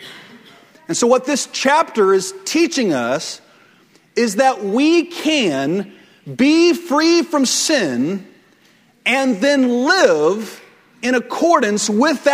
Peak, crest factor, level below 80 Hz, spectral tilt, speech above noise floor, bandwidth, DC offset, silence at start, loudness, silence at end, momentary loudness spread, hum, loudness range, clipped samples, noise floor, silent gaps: 0 dBFS; 16 dB; -66 dBFS; -3 dB/octave; 38 dB; 16 kHz; under 0.1%; 0 s; -16 LUFS; 0 s; 10 LU; none; 2 LU; under 0.1%; -53 dBFS; none